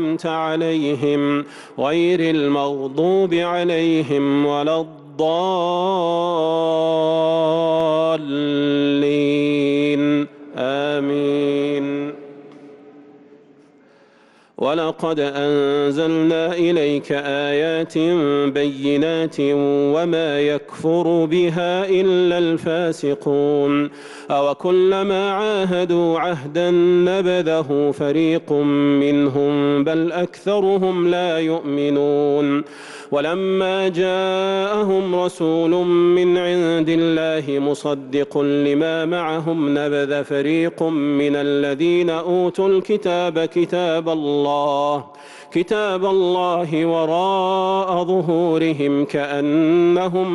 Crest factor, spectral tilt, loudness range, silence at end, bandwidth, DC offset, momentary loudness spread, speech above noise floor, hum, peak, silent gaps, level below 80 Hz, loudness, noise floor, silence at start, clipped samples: 10 dB; -6.5 dB/octave; 2 LU; 0 s; 11 kHz; under 0.1%; 5 LU; 34 dB; none; -8 dBFS; none; -62 dBFS; -19 LUFS; -52 dBFS; 0 s; under 0.1%